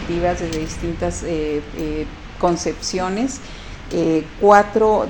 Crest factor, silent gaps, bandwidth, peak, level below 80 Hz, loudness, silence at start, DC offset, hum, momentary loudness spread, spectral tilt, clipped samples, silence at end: 20 dB; none; 17 kHz; 0 dBFS; -34 dBFS; -20 LUFS; 0 s; under 0.1%; none; 14 LU; -5 dB/octave; under 0.1%; 0 s